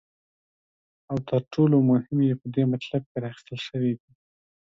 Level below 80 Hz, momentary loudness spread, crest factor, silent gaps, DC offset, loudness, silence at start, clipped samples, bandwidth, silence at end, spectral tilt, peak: -64 dBFS; 14 LU; 16 dB; 3.06-3.15 s; under 0.1%; -25 LUFS; 1.1 s; under 0.1%; 7.4 kHz; 0.8 s; -9 dB/octave; -10 dBFS